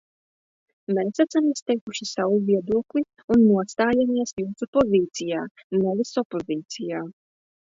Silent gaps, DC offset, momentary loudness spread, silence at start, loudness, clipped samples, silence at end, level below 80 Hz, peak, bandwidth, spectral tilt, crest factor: 1.62-1.66 s, 1.81-1.87 s, 3.24-3.28 s, 4.33-4.37 s, 4.68-4.73 s, 5.51-5.55 s, 5.64-5.70 s, 6.25-6.30 s; under 0.1%; 11 LU; 0.9 s; -24 LUFS; under 0.1%; 0.55 s; -58 dBFS; -8 dBFS; 7.8 kHz; -5.5 dB/octave; 16 dB